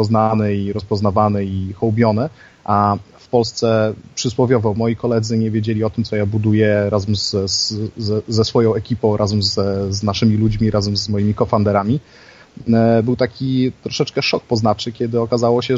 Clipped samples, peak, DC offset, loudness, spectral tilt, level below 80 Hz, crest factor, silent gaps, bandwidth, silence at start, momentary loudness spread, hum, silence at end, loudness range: under 0.1%; -2 dBFS; under 0.1%; -17 LUFS; -6 dB/octave; -44 dBFS; 16 dB; none; 7.8 kHz; 0 s; 6 LU; none; 0 s; 1 LU